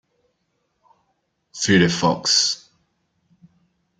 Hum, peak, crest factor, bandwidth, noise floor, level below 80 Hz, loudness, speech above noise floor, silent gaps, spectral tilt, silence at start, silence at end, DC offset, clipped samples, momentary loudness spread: none; -4 dBFS; 20 dB; 9.6 kHz; -72 dBFS; -58 dBFS; -18 LUFS; 53 dB; none; -3.5 dB/octave; 1.55 s; 1.45 s; under 0.1%; under 0.1%; 13 LU